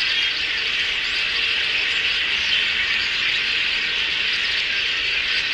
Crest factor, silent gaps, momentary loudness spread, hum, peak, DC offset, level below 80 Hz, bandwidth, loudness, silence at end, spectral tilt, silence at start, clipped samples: 14 dB; none; 2 LU; none; -6 dBFS; under 0.1%; -50 dBFS; 15 kHz; -19 LUFS; 0 s; 0 dB/octave; 0 s; under 0.1%